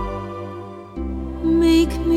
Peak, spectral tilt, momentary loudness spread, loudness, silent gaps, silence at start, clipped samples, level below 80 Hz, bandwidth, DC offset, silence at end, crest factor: -6 dBFS; -6.5 dB/octave; 18 LU; -20 LUFS; none; 0 s; under 0.1%; -30 dBFS; 14 kHz; under 0.1%; 0 s; 14 dB